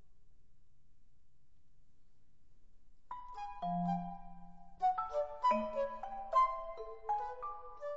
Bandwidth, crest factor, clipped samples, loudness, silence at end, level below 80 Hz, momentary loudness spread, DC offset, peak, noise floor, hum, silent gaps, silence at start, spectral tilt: 7.6 kHz; 20 dB; under 0.1%; -37 LUFS; 0 s; -60 dBFS; 16 LU; 0.2%; -22 dBFS; -70 dBFS; none; none; 0.25 s; -5.5 dB/octave